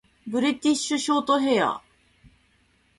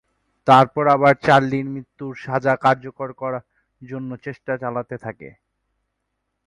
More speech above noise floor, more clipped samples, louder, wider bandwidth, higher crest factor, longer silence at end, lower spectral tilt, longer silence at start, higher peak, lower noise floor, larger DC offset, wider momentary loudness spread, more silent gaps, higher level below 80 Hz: second, 41 dB vs 57 dB; neither; second, -23 LUFS vs -18 LUFS; about the same, 11.5 kHz vs 11.5 kHz; about the same, 18 dB vs 20 dB; about the same, 1.2 s vs 1.15 s; second, -3 dB/octave vs -7 dB/octave; second, 0.25 s vs 0.45 s; second, -8 dBFS vs 0 dBFS; second, -64 dBFS vs -76 dBFS; neither; second, 7 LU vs 18 LU; neither; second, -64 dBFS vs -58 dBFS